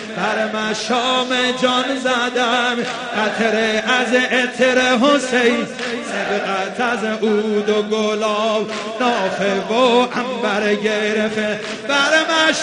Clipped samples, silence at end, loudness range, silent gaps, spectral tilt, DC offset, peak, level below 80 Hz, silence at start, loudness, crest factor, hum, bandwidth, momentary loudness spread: under 0.1%; 0 s; 3 LU; none; -3 dB/octave; under 0.1%; 0 dBFS; -60 dBFS; 0 s; -17 LUFS; 16 dB; none; 10.5 kHz; 7 LU